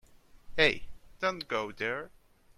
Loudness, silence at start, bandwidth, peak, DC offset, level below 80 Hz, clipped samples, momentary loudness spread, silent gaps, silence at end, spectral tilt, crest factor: -31 LUFS; 0.35 s; 14.5 kHz; -8 dBFS; under 0.1%; -54 dBFS; under 0.1%; 13 LU; none; 0.5 s; -4 dB/octave; 26 dB